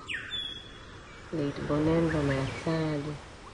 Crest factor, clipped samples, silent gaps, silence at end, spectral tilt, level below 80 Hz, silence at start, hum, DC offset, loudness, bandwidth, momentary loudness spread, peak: 16 dB; under 0.1%; none; 0 s; -6.5 dB/octave; -48 dBFS; 0 s; none; under 0.1%; -31 LUFS; 11 kHz; 19 LU; -16 dBFS